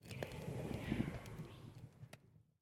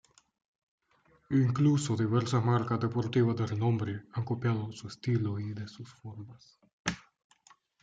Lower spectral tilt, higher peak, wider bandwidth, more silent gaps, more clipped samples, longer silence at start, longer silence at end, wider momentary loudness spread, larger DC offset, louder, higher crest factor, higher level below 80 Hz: about the same, -6.5 dB/octave vs -7 dB/octave; second, -24 dBFS vs -14 dBFS; first, 17.5 kHz vs 9.2 kHz; second, none vs 6.73-6.85 s; neither; second, 0 s vs 1.3 s; second, 0.2 s vs 0.85 s; about the same, 17 LU vs 19 LU; neither; second, -46 LUFS vs -31 LUFS; first, 24 dB vs 18 dB; first, -60 dBFS vs -66 dBFS